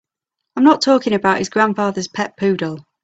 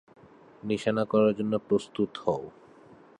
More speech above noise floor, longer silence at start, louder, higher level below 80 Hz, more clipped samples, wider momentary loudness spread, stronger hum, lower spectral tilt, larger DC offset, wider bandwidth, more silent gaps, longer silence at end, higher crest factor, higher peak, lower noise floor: first, 65 dB vs 27 dB; about the same, 0.55 s vs 0.65 s; first, -17 LUFS vs -28 LUFS; first, -58 dBFS vs -66 dBFS; neither; about the same, 10 LU vs 10 LU; neither; second, -5 dB/octave vs -7 dB/octave; neither; second, 8 kHz vs 10.5 kHz; neither; second, 0.2 s vs 0.7 s; about the same, 18 dB vs 18 dB; first, 0 dBFS vs -12 dBFS; first, -81 dBFS vs -54 dBFS